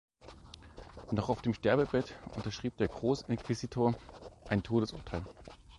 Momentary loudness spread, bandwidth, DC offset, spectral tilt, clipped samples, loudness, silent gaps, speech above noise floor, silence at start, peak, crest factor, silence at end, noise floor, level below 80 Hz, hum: 22 LU; 11.5 kHz; under 0.1%; -7 dB/octave; under 0.1%; -34 LUFS; none; 20 dB; 0.25 s; -16 dBFS; 20 dB; 0 s; -54 dBFS; -54 dBFS; none